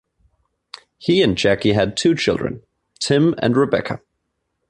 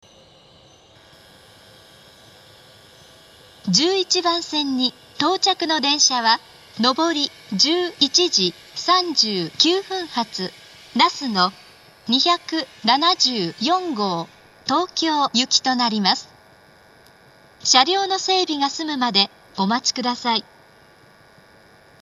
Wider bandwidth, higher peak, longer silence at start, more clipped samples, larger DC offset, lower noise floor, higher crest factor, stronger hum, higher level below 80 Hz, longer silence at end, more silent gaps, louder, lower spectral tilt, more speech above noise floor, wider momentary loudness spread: second, 11 kHz vs 12.5 kHz; second, -4 dBFS vs 0 dBFS; second, 1 s vs 3.65 s; neither; neither; first, -73 dBFS vs -51 dBFS; second, 16 dB vs 22 dB; neither; first, -48 dBFS vs -66 dBFS; second, 0.7 s vs 1.6 s; neither; about the same, -18 LUFS vs -19 LUFS; first, -5.5 dB/octave vs -2 dB/octave; first, 56 dB vs 31 dB; about the same, 12 LU vs 10 LU